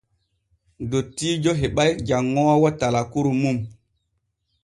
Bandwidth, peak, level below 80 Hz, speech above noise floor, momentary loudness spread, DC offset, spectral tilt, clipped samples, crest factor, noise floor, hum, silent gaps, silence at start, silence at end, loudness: 11.5 kHz; -4 dBFS; -46 dBFS; 53 dB; 8 LU; under 0.1%; -6 dB/octave; under 0.1%; 18 dB; -74 dBFS; none; none; 0.8 s; 0.9 s; -21 LUFS